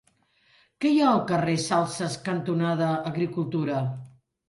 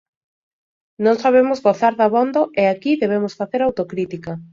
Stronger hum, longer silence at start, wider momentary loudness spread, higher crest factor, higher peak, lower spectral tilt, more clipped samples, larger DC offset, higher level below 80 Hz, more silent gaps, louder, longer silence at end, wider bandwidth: neither; second, 0.8 s vs 1 s; about the same, 8 LU vs 10 LU; about the same, 16 dB vs 16 dB; second, -10 dBFS vs -2 dBFS; about the same, -6 dB/octave vs -7 dB/octave; neither; neither; second, -66 dBFS vs -60 dBFS; neither; second, -26 LUFS vs -18 LUFS; first, 0.4 s vs 0.1 s; first, 11.5 kHz vs 7.4 kHz